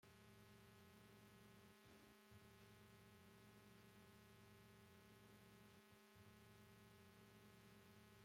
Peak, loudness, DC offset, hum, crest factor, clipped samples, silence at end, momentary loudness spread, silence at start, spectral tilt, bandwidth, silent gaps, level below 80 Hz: -52 dBFS; -68 LUFS; under 0.1%; none; 16 dB; under 0.1%; 0 s; 1 LU; 0 s; -4.5 dB/octave; 16.5 kHz; none; -84 dBFS